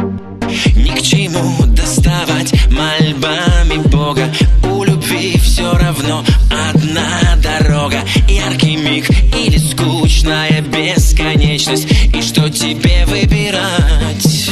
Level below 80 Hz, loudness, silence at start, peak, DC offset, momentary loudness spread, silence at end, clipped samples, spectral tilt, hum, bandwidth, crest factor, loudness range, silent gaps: -14 dBFS; -12 LUFS; 0 s; 0 dBFS; under 0.1%; 2 LU; 0 s; under 0.1%; -4.5 dB/octave; none; 13 kHz; 10 dB; 1 LU; none